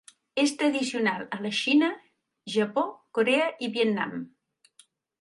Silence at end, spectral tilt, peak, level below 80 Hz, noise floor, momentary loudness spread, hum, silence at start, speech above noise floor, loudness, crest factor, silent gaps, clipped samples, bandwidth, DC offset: 0.95 s; -4 dB/octave; -10 dBFS; -78 dBFS; -62 dBFS; 11 LU; none; 0.35 s; 36 dB; -26 LUFS; 18 dB; none; under 0.1%; 11.5 kHz; under 0.1%